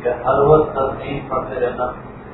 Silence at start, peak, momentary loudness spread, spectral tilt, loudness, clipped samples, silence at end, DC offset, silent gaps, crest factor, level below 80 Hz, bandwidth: 0 s; 0 dBFS; 13 LU; -11.5 dB/octave; -18 LUFS; under 0.1%; 0 s; under 0.1%; none; 18 dB; -38 dBFS; 4.1 kHz